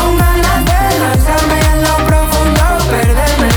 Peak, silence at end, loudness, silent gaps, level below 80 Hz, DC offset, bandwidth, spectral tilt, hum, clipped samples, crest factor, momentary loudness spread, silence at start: 0 dBFS; 0 s; -11 LUFS; none; -14 dBFS; under 0.1%; over 20 kHz; -5 dB/octave; none; under 0.1%; 10 dB; 1 LU; 0 s